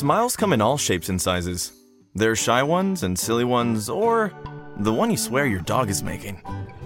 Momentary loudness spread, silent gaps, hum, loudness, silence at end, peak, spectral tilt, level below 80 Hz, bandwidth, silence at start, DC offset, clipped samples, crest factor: 13 LU; none; none; -22 LUFS; 0 s; -4 dBFS; -4.5 dB/octave; -50 dBFS; 17 kHz; 0 s; under 0.1%; under 0.1%; 18 dB